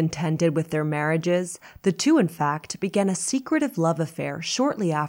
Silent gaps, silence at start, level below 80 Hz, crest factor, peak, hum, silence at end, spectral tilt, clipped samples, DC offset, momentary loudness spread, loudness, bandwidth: none; 0 s; -62 dBFS; 16 dB; -8 dBFS; none; 0 s; -5 dB/octave; under 0.1%; under 0.1%; 7 LU; -24 LUFS; 16.5 kHz